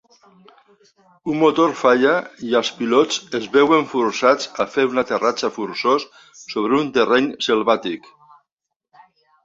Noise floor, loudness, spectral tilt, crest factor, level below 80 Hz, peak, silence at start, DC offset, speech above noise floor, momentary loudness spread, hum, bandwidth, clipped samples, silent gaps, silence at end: -81 dBFS; -18 LUFS; -4 dB/octave; 18 dB; -64 dBFS; -2 dBFS; 1.25 s; under 0.1%; 62 dB; 9 LU; none; 7.8 kHz; under 0.1%; none; 1.45 s